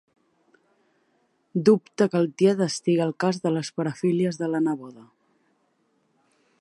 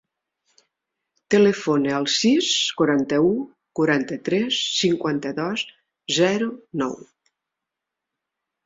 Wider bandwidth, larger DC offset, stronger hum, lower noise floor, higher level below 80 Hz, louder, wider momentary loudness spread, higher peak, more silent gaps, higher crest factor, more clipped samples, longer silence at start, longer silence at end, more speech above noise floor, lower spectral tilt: first, 11.5 kHz vs 7.8 kHz; neither; neither; second, -69 dBFS vs -84 dBFS; second, -74 dBFS vs -64 dBFS; second, -24 LUFS vs -21 LUFS; second, 7 LU vs 10 LU; about the same, -6 dBFS vs -6 dBFS; neither; about the same, 20 dB vs 18 dB; neither; first, 1.55 s vs 1.3 s; about the same, 1.6 s vs 1.7 s; second, 46 dB vs 64 dB; first, -6.5 dB/octave vs -4 dB/octave